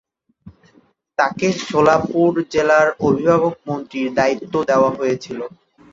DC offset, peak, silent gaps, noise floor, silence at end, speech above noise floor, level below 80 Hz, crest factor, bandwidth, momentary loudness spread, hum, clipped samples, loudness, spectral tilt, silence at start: under 0.1%; -2 dBFS; none; -56 dBFS; 0.45 s; 39 dB; -54 dBFS; 16 dB; 7.8 kHz; 12 LU; none; under 0.1%; -17 LUFS; -6 dB/octave; 0.45 s